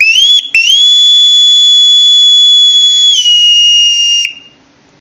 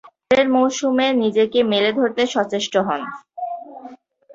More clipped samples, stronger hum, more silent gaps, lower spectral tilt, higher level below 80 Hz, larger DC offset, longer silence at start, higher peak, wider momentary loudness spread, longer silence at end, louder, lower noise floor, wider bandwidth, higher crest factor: first, 0.2% vs under 0.1%; neither; neither; second, 5.5 dB/octave vs -4 dB/octave; about the same, -58 dBFS vs -60 dBFS; neither; about the same, 0 s vs 0.05 s; first, 0 dBFS vs -4 dBFS; second, 4 LU vs 14 LU; first, 0.6 s vs 0.4 s; first, -2 LUFS vs -18 LUFS; about the same, -44 dBFS vs -42 dBFS; first, 16.5 kHz vs 7.8 kHz; second, 6 dB vs 16 dB